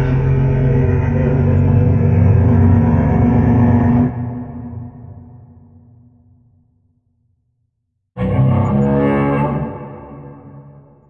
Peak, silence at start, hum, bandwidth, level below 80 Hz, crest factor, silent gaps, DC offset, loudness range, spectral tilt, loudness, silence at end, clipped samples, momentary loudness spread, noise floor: -2 dBFS; 0 s; none; 3.5 kHz; -30 dBFS; 14 dB; none; under 0.1%; 12 LU; -11.5 dB/octave; -14 LUFS; 0.4 s; under 0.1%; 20 LU; -70 dBFS